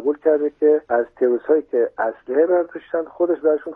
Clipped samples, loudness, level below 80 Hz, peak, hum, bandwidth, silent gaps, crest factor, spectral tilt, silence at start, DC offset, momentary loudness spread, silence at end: under 0.1%; -20 LUFS; -66 dBFS; -4 dBFS; none; 3.5 kHz; none; 14 dB; -9 dB/octave; 0 s; under 0.1%; 7 LU; 0 s